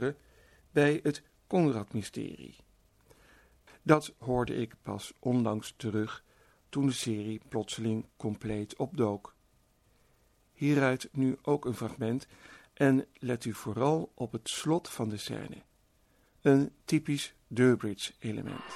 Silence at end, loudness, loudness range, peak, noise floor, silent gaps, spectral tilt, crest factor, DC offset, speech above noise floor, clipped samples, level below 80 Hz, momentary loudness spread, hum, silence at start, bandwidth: 0 s; -32 LUFS; 4 LU; -8 dBFS; -68 dBFS; none; -6 dB/octave; 24 dB; under 0.1%; 37 dB; under 0.1%; -62 dBFS; 12 LU; none; 0 s; 13.5 kHz